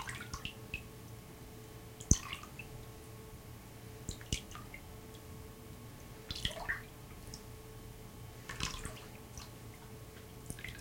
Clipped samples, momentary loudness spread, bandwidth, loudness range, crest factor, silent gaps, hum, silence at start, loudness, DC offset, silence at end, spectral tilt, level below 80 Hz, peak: under 0.1%; 12 LU; 17 kHz; 7 LU; 36 dB; none; none; 0 s; -44 LUFS; under 0.1%; 0 s; -3 dB/octave; -52 dBFS; -8 dBFS